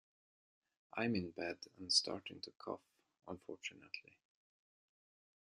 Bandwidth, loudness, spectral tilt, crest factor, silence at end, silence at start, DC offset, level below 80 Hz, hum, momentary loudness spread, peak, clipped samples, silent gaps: 11.5 kHz; -41 LUFS; -3 dB/octave; 26 dB; 1.45 s; 0.95 s; under 0.1%; -84 dBFS; none; 17 LU; -20 dBFS; under 0.1%; none